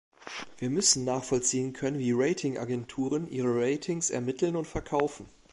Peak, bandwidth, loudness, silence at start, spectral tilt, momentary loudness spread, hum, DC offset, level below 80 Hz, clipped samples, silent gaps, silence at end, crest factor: -10 dBFS; 11.5 kHz; -29 LUFS; 0.2 s; -4 dB/octave; 9 LU; none; under 0.1%; -56 dBFS; under 0.1%; none; 0.25 s; 20 dB